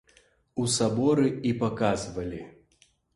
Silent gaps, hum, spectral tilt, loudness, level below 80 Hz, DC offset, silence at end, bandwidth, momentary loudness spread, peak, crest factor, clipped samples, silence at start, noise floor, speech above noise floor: none; none; -5 dB/octave; -27 LUFS; -54 dBFS; under 0.1%; 0.65 s; 11.5 kHz; 13 LU; -12 dBFS; 16 dB; under 0.1%; 0.55 s; -65 dBFS; 39 dB